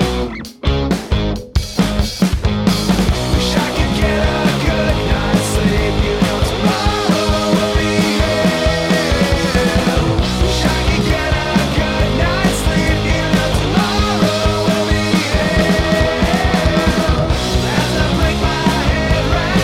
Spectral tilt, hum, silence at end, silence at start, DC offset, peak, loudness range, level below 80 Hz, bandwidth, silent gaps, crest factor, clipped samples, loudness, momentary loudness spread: -5 dB/octave; none; 0 s; 0 s; under 0.1%; -2 dBFS; 1 LU; -22 dBFS; 16.5 kHz; none; 12 dB; under 0.1%; -15 LUFS; 2 LU